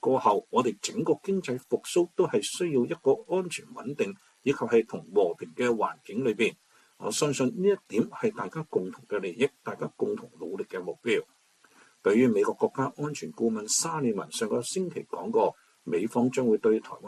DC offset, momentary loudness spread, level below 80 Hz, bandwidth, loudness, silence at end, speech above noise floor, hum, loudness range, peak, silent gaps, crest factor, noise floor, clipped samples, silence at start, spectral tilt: under 0.1%; 10 LU; -74 dBFS; 13.5 kHz; -28 LUFS; 0 s; 33 dB; none; 4 LU; -10 dBFS; none; 18 dB; -60 dBFS; under 0.1%; 0.05 s; -4.5 dB/octave